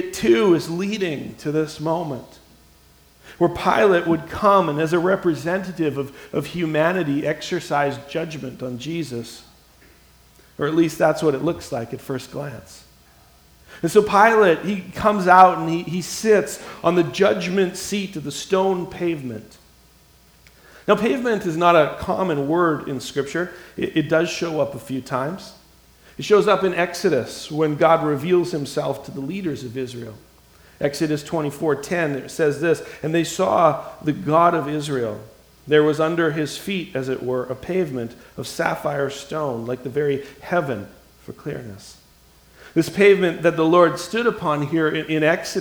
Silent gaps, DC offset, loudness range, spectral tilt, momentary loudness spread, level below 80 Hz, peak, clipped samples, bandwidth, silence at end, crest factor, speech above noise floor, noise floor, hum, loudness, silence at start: none; under 0.1%; 7 LU; -5.5 dB/octave; 14 LU; -54 dBFS; 0 dBFS; under 0.1%; over 20 kHz; 0 s; 20 dB; 32 dB; -53 dBFS; none; -20 LUFS; 0 s